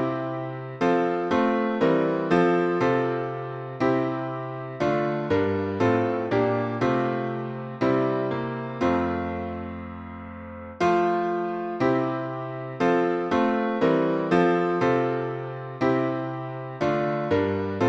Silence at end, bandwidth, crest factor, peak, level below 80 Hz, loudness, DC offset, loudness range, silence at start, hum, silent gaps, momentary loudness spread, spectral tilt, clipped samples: 0 s; 7.8 kHz; 16 dB; -8 dBFS; -56 dBFS; -25 LUFS; under 0.1%; 4 LU; 0 s; none; none; 11 LU; -8 dB/octave; under 0.1%